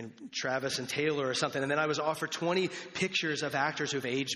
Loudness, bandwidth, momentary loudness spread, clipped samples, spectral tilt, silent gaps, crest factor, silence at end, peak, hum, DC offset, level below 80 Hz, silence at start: -32 LUFS; 12.5 kHz; 4 LU; under 0.1%; -3.5 dB/octave; none; 20 dB; 0 s; -14 dBFS; none; under 0.1%; -74 dBFS; 0 s